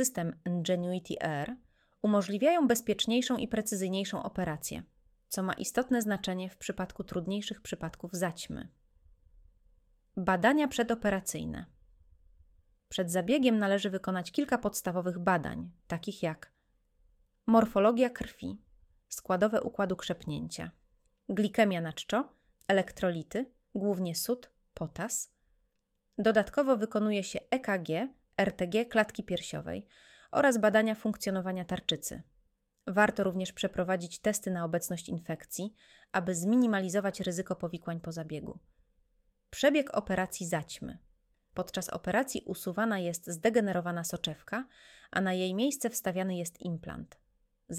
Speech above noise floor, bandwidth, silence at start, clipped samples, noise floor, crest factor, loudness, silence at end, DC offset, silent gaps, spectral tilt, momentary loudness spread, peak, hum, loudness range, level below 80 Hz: 47 dB; 16.5 kHz; 0 s; under 0.1%; -78 dBFS; 22 dB; -32 LUFS; 0 s; under 0.1%; none; -4.5 dB/octave; 14 LU; -10 dBFS; none; 4 LU; -62 dBFS